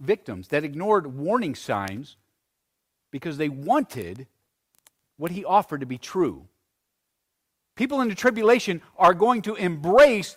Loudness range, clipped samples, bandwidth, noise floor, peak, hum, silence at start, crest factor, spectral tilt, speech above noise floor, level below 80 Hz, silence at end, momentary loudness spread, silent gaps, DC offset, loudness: 8 LU; under 0.1%; 16 kHz; -79 dBFS; -6 dBFS; none; 0 s; 18 dB; -5.5 dB/octave; 57 dB; -60 dBFS; 0.05 s; 16 LU; none; under 0.1%; -23 LUFS